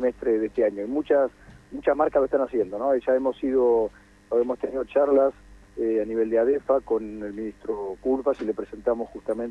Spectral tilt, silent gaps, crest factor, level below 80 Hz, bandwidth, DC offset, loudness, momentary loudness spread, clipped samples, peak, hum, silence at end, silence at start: -7.5 dB/octave; none; 16 dB; -54 dBFS; 9.2 kHz; under 0.1%; -25 LUFS; 10 LU; under 0.1%; -8 dBFS; none; 0 s; 0 s